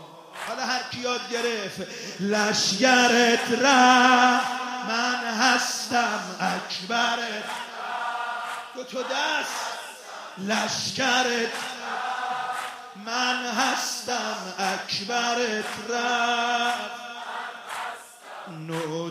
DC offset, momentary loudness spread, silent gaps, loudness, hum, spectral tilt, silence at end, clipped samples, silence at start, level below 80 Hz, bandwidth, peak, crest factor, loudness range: under 0.1%; 16 LU; none; -24 LUFS; none; -2 dB/octave; 0 s; under 0.1%; 0 s; -76 dBFS; 15.5 kHz; -4 dBFS; 22 dB; 9 LU